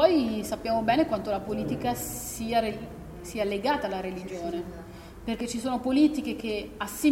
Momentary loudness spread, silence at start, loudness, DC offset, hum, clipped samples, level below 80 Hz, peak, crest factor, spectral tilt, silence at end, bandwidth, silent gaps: 14 LU; 0 s; -29 LUFS; under 0.1%; none; under 0.1%; -50 dBFS; -8 dBFS; 18 dB; -5 dB/octave; 0 s; 16.5 kHz; none